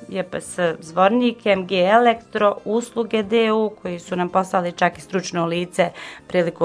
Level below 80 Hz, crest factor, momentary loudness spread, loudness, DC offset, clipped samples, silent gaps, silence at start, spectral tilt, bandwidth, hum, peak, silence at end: -60 dBFS; 20 dB; 10 LU; -20 LUFS; under 0.1%; under 0.1%; none; 0 s; -5 dB/octave; 11 kHz; none; 0 dBFS; 0 s